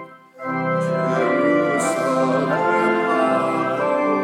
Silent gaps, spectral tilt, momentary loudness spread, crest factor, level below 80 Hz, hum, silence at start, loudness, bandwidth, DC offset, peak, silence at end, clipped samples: none; -6 dB/octave; 4 LU; 14 dB; -74 dBFS; none; 0 s; -19 LUFS; 16 kHz; under 0.1%; -6 dBFS; 0 s; under 0.1%